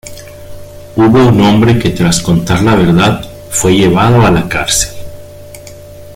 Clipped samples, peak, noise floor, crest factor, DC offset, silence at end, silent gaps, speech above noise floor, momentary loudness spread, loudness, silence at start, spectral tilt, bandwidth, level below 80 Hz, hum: under 0.1%; 0 dBFS; -30 dBFS; 10 dB; under 0.1%; 0 s; none; 22 dB; 16 LU; -9 LUFS; 0.05 s; -5 dB/octave; 16.5 kHz; -32 dBFS; none